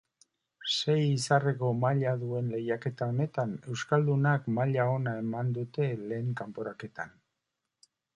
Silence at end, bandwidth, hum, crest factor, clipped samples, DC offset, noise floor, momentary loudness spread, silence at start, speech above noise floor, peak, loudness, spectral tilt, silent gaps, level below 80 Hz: 1.05 s; 11 kHz; none; 20 dB; under 0.1%; under 0.1%; -85 dBFS; 12 LU; 0.6 s; 56 dB; -12 dBFS; -30 LUFS; -6 dB/octave; none; -72 dBFS